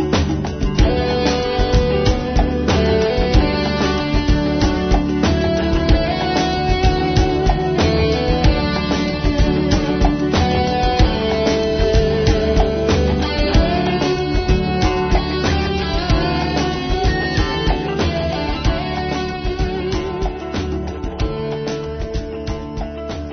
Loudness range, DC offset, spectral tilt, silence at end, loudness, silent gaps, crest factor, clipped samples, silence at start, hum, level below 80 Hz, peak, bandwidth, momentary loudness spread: 5 LU; under 0.1%; -6 dB/octave; 0 s; -18 LUFS; none; 14 dB; under 0.1%; 0 s; none; -22 dBFS; -2 dBFS; 6.6 kHz; 7 LU